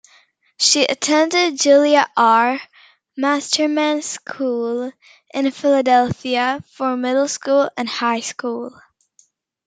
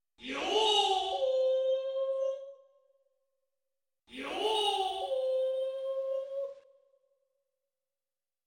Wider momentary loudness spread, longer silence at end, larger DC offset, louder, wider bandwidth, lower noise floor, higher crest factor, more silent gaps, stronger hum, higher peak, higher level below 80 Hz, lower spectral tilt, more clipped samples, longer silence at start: about the same, 12 LU vs 13 LU; second, 1 s vs 1.85 s; neither; first, -17 LUFS vs -31 LUFS; second, 9.6 kHz vs 16.5 kHz; second, -58 dBFS vs under -90 dBFS; about the same, 18 dB vs 18 dB; neither; neither; first, -2 dBFS vs -16 dBFS; first, -66 dBFS vs -74 dBFS; first, -2.5 dB/octave vs -1 dB/octave; neither; first, 0.6 s vs 0.2 s